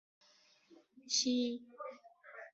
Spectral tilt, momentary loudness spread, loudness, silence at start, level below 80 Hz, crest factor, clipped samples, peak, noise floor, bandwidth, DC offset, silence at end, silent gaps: -1 dB/octave; 22 LU; -35 LUFS; 0.7 s; -86 dBFS; 20 dB; under 0.1%; -20 dBFS; -69 dBFS; 8 kHz; under 0.1%; 0.05 s; none